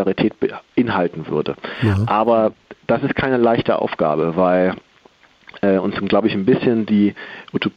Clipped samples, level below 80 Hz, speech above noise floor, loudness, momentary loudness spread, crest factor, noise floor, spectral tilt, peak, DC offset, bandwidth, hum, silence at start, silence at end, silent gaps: under 0.1%; -52 dBFS; 34 dB; -18 LUFS; 7 LU; 14 dB; -52 dBFS; -8.5 dB/octave; -4 dBFS; under 0.1%; 6.6 kHz; none; 0 s; 0.05 s; none